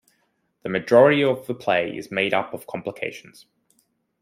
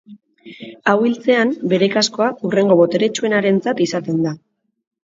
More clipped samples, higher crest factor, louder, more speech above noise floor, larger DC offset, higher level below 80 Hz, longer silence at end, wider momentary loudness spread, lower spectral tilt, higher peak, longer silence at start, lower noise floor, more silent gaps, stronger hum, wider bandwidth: neither; about the same, 20 dB vs 16 dB; second, -21 LUFS vs -17 LUFS; first, 48 dB vs 25 dB; neither; about the same, -68 dBFS vs -64 dBFS; first, 1 s vs 0.7 s; first, 16 LU vs 8 LU; about the same, -6 dB/octave vs -5 dB/octave; second, -4 dBFS vs 0 dBFS; first, 0.65 s vs 0.1 s; first, -69 dBFS vs -41 dBFS; neither; neither; first, 16 kHz vs 7.8 kHz